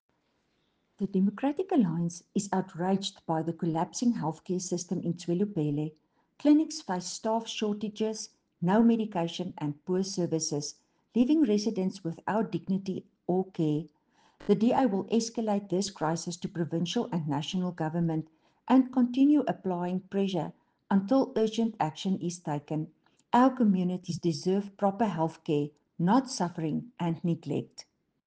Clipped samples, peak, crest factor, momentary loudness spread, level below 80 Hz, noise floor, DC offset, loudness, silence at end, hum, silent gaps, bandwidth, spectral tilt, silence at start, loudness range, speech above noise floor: under 0.1%; -12 dBFS; 18 dB; 10 LU; -70 dBFS; -74 dBFS; under 0.1%; -30 LUFS; 0.45 s; none; none; 9.8 kHz; -6 dB/octave; 1 s; 3 LU; 45 dB